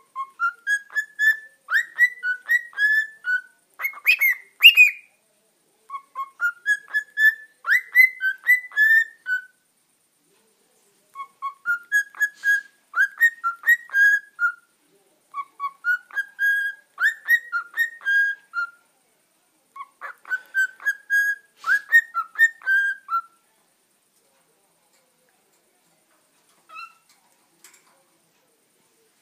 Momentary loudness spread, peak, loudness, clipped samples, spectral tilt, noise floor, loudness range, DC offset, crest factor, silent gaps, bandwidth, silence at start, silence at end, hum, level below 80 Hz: 17 LU; 0 dBFS; -20 LUFS; under 0.1%; 4.5 dB/octave; -66 dBFS; 9 LU; under 0.1%; 24 dB; none; 15.5 kHz; 0.15 s; 2.35 s; none; under -90 dBFS